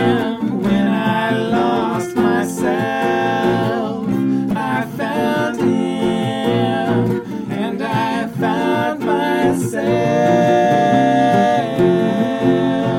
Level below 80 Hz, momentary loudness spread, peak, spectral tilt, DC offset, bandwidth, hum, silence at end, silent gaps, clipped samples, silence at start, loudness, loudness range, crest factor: -50 dBFS; 6 LU; -2 dBFS; -6.5 dB/octave; under 0.1%; 16.5 kHz; none; 0 s; none; under 0.1%; 0 s; -17 LUFS; 4 LU; 14 dB